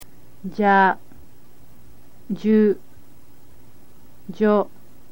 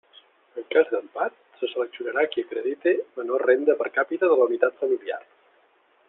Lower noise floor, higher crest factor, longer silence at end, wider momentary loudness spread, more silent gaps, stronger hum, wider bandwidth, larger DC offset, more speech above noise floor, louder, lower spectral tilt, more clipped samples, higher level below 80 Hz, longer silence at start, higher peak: second, -52 dBFS vs -62 dBFS; about the same, 18 dB vs 20 dB; second, 0.45 s vs 0.9 s; first, 17 LU vs 11 LU; neither; neither; first, 16.5 kHz vs 4 kHz; first, 2% vs under 0.1%; second, 34 dB vs 38 dB; first, -20 LUFS vs -24 LUFS; about the same, -7.5 dB/octave vs -6.5 dB/octave; neither; first, -58 dBFS vs -78 dBFS; second, 0 s vs 0.55 s; about the same, -4 dBFS vs -6 dBFS